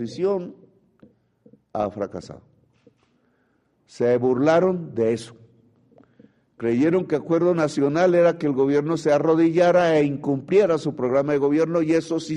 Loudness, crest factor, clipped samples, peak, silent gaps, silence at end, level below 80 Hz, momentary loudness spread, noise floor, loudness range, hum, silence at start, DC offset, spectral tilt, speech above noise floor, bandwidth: -21 LUFS; 16 dB; under 0.1%; -6 dBFS; none; 0 s; -62 dBFS; 11 LU; -66 dBFS; 12 LU; none; 0 s; under 0.1%; -7 dB/octave; 46 dB; 11 kHz